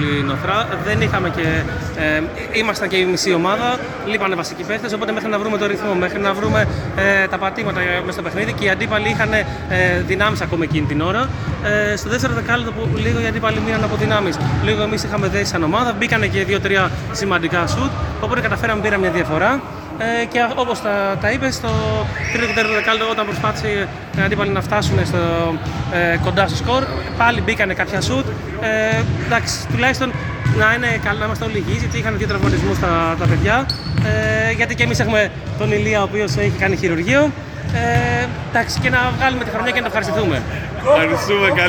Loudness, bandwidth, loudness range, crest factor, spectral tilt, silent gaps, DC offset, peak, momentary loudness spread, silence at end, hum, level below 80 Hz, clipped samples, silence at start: -18 LUFS; 18 kHz; 2 LU; 16 dB; -5.5 dB/octave; none; under 0.1%; 0 dBFS; 5 LU; 0 s; none; -34 dBFS; under 0.1%; 0 s